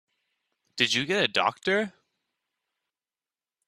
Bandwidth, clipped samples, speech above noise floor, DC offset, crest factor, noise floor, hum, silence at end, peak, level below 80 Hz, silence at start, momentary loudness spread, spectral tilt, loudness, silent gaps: 14 kHz; under 0.1%; over 64 dB; under 0.1%; 26 dB; under -90 dBFS; none; 1.8 s; -6 dBFS; -72 dBFS; 0.75 s; 10 LU; -3 dB/octave; -25 LUFS; none